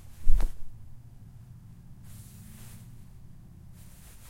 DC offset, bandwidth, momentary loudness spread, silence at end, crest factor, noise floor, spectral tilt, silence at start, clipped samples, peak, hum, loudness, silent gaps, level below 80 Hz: under 0.1%; 11 kHz; 18 LU; 3.55 s; 20 dB; -48 dBFS; -5.5 dB/octave; 0.2 s; under 0.1%; -6 dBFS; none; -42 LUFS; none; -32 dBFS